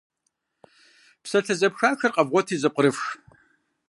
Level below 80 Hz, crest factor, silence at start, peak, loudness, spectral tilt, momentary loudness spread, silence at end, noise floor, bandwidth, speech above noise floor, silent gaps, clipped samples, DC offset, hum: -76 dBFS; 22 dB; 1.25 s; -4 dBFS; -23 LUFS; -4.5 dB/octave; 11 LU; 0.75 s; -76 dBFS; 11.5 kHz; 54 dB; none; under 0.1%; under 0.1%; none